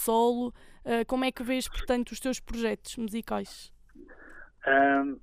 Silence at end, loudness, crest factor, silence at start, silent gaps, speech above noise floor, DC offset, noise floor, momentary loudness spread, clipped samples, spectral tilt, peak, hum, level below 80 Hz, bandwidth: 0.05 s; -29 LUFS; 18 dB; 0 s; none; 22 dB; under 0.1%; -51 dBFS; 13 LU; under 0.1%; -3.5 dB/octave; -12 dBFS; none; -46 dBFS; 15.5 kHz